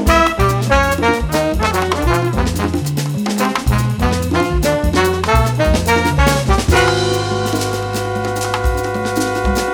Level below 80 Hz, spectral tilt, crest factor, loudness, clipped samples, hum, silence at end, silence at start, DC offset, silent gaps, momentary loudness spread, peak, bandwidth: -22 dBFS; -5 dB/octave; 14 dB; -16 LUFS; under 0.1%; none; 0 s; 0 s; under 0.1%; none; 6 LU; 0 dBFS; over 20 kHz